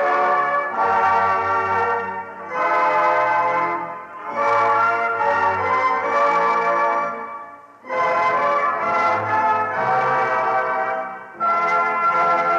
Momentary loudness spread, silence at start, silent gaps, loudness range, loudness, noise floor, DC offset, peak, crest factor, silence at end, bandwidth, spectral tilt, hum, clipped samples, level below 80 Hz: 10 LU; 0 s; none; 1 LU; -19 LUFS; -39 dBFS; under 0.1%; -8 dBFS; 12 dB; 0 s; 8.6 kHz; -5 dB/octave; none; under 0.1%; -66 dBFS